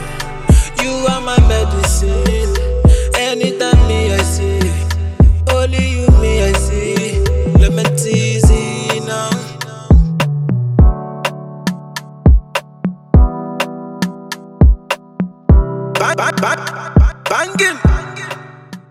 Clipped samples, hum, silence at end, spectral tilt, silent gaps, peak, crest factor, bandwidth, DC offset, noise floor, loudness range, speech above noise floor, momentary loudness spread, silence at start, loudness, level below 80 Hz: under 0.1%; none; 0.1 s; -5.5 dB/octave; none; -2 dBFS; 12 dB; 14 kHz; under 0.1%; -34 dBFS; 3 LU; 22 dB; 11 LU; 0 s; -14 LUFS; -16 dBFS